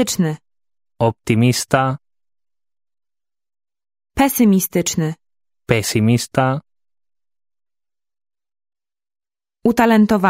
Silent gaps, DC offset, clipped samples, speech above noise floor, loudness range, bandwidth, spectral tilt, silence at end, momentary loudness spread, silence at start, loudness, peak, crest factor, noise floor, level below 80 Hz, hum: none; under 0.1%; under 0.1%; over 75 dB; 6 LU; 16 kHz; -5.5 dB/octave; 0 s; 12 LU; 0 s; -17 LUFS; 0 dBFS; 18 dB; under -90 dBFS; -48 dBFS; none